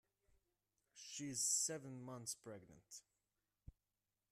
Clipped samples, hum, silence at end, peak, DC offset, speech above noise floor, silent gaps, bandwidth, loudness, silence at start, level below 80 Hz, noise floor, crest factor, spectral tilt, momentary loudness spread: under 0.1%; none; 1.3 s; -28 dBFS; under 0.1%; over 44 dB; none; 15.5 kHz; -43 LUFS; 0.95 s; -78 dBFS; under -90 dBFS; 22 dB; -2 dB/octave; 22 LU